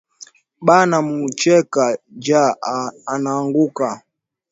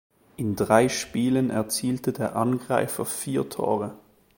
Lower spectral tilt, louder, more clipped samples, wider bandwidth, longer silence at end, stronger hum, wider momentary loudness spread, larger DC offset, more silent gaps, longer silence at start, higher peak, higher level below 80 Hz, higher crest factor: about the same, -5 dB/octave vs -5 dB/octave; first, -17 LUFS vs -25 LUFS; neither; second, 8 kHz vs 17 kHz; first, 0.55 s vs 0.4 s; neither; first, 11 LU vs 8 LU; neither; neither; second, 0.2 s vs 0.4 s; about the same, 0 dBFS vs -2 dBFS; second, -66 dBFS vs -58 dBFS; about the same, 18 dB vs 22 dB